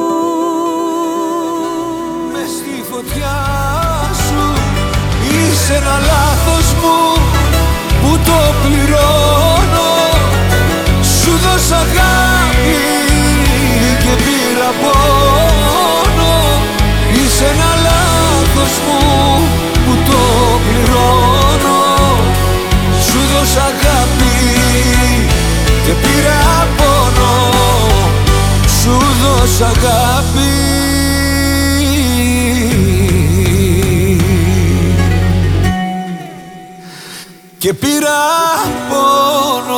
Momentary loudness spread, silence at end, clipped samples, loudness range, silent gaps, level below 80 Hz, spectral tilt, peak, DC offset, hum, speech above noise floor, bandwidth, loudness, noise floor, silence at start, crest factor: 6 LU; 0 s; under 0.1%; 5 LU; none; -16 dBFS; -4.5 dB/octave; 0 dBFS; under 0.1%; none; 22 dB; 18.5 kHz; -11 LUFS; -33 dBFS; 0 s; 10 dB